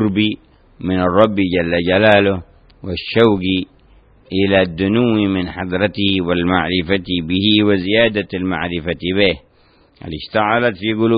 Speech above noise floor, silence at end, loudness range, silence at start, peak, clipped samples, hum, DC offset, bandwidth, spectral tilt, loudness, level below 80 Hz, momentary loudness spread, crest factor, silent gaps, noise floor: 37 dB; 0 s; 2 LU; 0 s; 0 dBFS; under 0.1%; none; under 0.1%; 5.2 kHz; -8.5 dB/octave; -16 LUFS; -44 dBFS; 12 LU; 16 dB; none; -52 dBFS